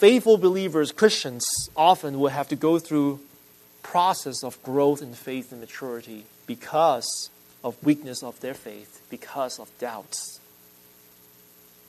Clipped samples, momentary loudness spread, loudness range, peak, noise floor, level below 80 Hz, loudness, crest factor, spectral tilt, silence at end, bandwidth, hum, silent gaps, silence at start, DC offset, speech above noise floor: under 0.1%; 19 LU; 10 LU; -2 dBFS; -53 dBFS; -66 dBFS; -24 LUFS; 22 dB; -4 dB/octave; 1.5 s; 13.5 kHz; none; none; 0 s; under 0.1%; 30 dB